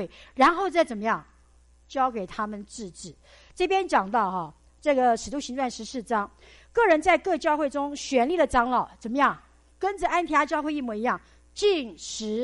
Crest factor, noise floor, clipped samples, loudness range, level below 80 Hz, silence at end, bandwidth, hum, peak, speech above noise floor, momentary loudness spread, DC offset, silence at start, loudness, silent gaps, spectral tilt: 18 dB; -57 dBFS; under 0.1%; 4 LU; -52 dBFS; 0 s; 11.5 kHz; none; -8 dBFS; 32 dB; 14 LU; under 0.1%; 0 s; -25 LUFS; none; -4 dB/octave